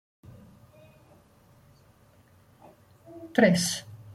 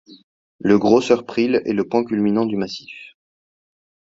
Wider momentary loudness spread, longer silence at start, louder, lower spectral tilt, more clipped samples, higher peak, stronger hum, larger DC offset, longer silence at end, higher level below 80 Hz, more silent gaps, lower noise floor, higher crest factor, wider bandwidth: first, 26 LU vs 15 LU; first, 3.1 s vs 0.1 s; second, -25 LUFS vs -19 LUFS; second, -4.5 dB/octave vs -6.5 dB/octave; neither; second, -6 dBFS vs 0 dBFS; neither; neither; second, 0 s vs 1 s; second, -66 dBFS vs -58 dBFS; second, none vs 0.23-0.59 s; second, -59 dBFS vs under -90 dBFS; about the same, 24 dB vs 20 dB; first, 15.5 kHz vs 7.8 kHz